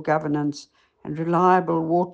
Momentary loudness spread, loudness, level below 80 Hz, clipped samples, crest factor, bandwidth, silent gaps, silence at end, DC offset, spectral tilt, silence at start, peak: 18 LU; -22 LUFS; -64 dBFS; under 0.1%; 16 dB; 8.2 kHz; none; 0 s; under 0.1%; -7.5 dB/octave; 0 s; -6 dBFS